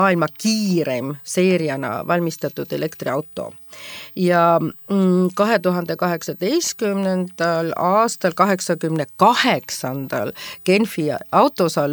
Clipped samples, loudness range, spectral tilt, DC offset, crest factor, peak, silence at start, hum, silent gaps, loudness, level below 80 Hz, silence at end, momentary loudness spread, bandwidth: under 0.1%; 3 LU; -5 dB/octave; under 0.1%; 18 dB; 0 dBFS; 0 s; none; none; -19 LUFS; -66 dBFS; 0 s; 9 LU; 19.5 kHz